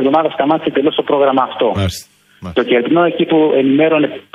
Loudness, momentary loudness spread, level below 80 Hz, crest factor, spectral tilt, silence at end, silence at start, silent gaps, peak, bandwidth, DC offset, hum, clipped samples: -14 LUFS; 8 LU; -46 dBFS; 12 dB; -6 dB/octave; 0.15 s; 0 s; none; 0 dBFS; 14.5 kHz; under 0.1%; none; under 0.1%